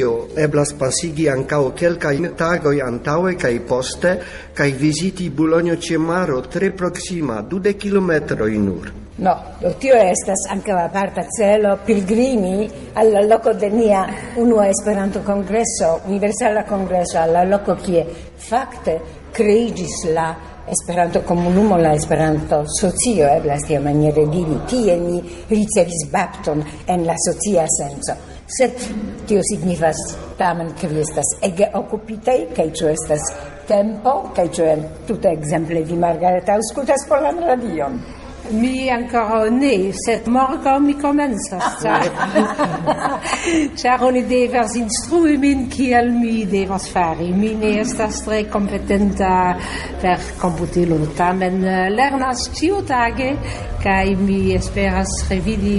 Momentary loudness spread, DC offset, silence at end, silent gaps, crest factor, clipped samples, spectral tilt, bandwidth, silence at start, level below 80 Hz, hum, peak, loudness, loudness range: 7 LU; under 0.1%; 0 s; none; 14 dB; under 0.1%; -5 dB/octave; 11.5 kHz; 0 s; -36 dBFS; none; -2 dBFS; -18 LUFS; 3 LU